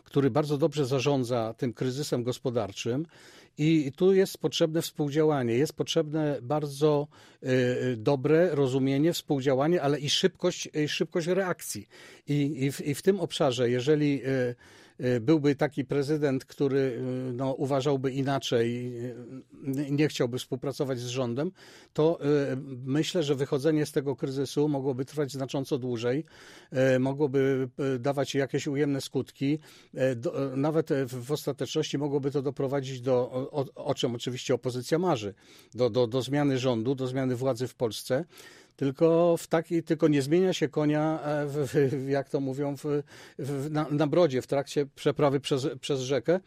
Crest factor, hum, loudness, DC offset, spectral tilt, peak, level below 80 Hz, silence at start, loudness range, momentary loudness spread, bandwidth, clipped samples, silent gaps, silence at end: 18 dB; none; -28 LUFS; under 0.1%; -6 dB/octave; -10 dBFS; -66 dBFS; 0.15 s; 4 LU; 8 LU; 15 kHz; under 0.1%; none; 0.05 s